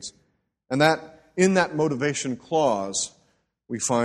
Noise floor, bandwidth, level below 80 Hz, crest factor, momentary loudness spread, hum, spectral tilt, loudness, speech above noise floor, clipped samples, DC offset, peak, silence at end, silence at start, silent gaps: -70 dBFS; 12.5 kHz; -62 dBFS; 20 dB; 12 LU; none; -4 dB/octave; -24 LUFS; 47 dB; under 0.1%; under 0.1%; -4 dBFS; 0 s; 0 s; none